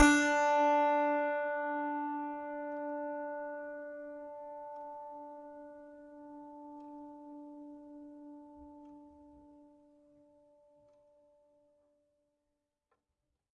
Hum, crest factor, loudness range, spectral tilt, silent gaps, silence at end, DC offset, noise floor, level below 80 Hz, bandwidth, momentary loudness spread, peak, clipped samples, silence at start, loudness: none; 26 dB; 23 LU; -3.5 dB/octave; none; 4.2 s; under 0.1%; -86 dBFS; -62 dBFS; 10.5 kHz; 25 LU; -12 dBFS; under 0.1%; 0 s; -34 LUFS